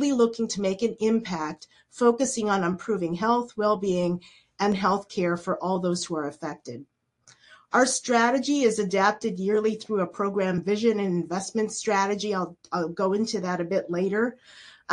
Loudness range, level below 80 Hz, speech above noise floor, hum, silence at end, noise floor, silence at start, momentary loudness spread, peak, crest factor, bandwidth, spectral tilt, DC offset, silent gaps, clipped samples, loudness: 4 LU; -66 dBFS; 34 dB; none; 0 s; -59 dBFS; 0 s; 9 LU; -6 dBFS; 18 dB; 11.5 kHz; -4.5 dB/octave; under 0.1%; none; under 0.1%; -26 LUFS